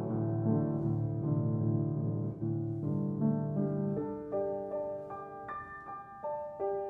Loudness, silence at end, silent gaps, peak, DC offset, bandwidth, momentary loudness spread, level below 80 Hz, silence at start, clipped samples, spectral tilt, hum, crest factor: -35 LUFS; 0 s; none; -18 dBFS; under 0.1%; 2.5 kHz; 11 LU; -64 dBFS; 0 s; under 0.1%; -13 dB/octave; none; 16 dB